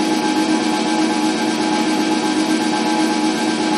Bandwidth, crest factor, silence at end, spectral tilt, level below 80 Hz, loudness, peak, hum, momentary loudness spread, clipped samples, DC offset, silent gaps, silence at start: 13 kHz; 12 dB; 0 s; -3.5 dB/octave; -62 dBFS; -17 LUFS; -6 dBFS; none; 1 LU; under 0.1%; under 0.1%; none; 0 s